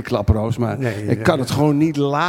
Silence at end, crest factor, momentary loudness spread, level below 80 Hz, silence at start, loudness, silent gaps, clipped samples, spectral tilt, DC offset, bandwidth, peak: 0 s; 16 dB; 5 LU; -34 dBFS; 0 s; -19 LUFS; none; under 0.1%; -7 dB/octave; under 0.1%; 16.5 kHz; -2 dBFS